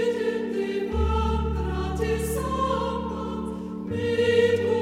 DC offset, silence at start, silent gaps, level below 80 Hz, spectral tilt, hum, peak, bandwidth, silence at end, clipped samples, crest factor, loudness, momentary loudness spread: under 0.1%; 0 s; none; -34 dBFS; -6 dB/octave; none; -8 dBFS; 16 kHz; 0 s; under 0.1%; 16 dB; -26 LUFS; 10 LU